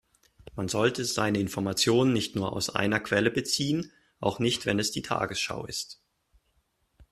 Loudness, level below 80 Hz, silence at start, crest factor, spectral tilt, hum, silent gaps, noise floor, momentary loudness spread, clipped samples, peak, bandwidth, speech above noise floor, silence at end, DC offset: -28 LUFS; -60 dBFS; 0.55 s; 22 dB; -4 dB/octave; none; none; -72 dBFS; 10 LU; under 0.1%; -8 dBFS; 14 kHz; 45 dB; 0.1 s; under 0.1%